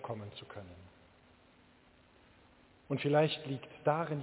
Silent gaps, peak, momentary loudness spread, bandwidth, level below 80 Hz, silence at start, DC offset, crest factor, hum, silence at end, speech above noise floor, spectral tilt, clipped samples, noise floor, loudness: none; -16 dBFS; 20 LU; 4 kHz; -70 dBFS; 0 s; under 0.1%; 22 dB; none; 0 s; 30 dB; -5 dB/octave; under 0.1%; -64 dBFS; -34 LUFS